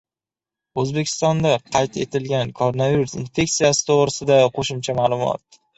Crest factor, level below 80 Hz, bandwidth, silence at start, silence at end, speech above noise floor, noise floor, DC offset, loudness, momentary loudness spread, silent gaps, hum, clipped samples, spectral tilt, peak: 18 dB; -52 dBFS; 8.4 kHz; 0.75 s; 0.4 s; over 71 dB; under -90 dBFS; under 0.1%; -20 LUFS; 8 LU; none; none; under 0.1%; -4.5 dB/octave; -2 dBFS